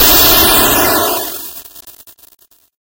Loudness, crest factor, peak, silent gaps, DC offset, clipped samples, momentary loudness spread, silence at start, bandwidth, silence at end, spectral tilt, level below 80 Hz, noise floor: -8 LUFS; 12 dB; 0 dBFS; none; under 0.1%; 0.5%; 20 LU; 0 s; over 20 kHz; 0.95 s; -1.5 dB/octave; -32 dBFS; -39 dBFS